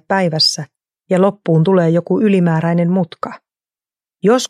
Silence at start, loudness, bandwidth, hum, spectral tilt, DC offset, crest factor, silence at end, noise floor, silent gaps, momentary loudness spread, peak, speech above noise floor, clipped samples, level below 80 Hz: 0.1 s; -14 LUFS; 13 kHz; none; -5.5 dB/octave; under 0.1%; 14 dB; 0.05 s; under -90 dBFS; none; 13 LU; -2 dBFS; over 76 dB; under 0.1%; -64 dBFS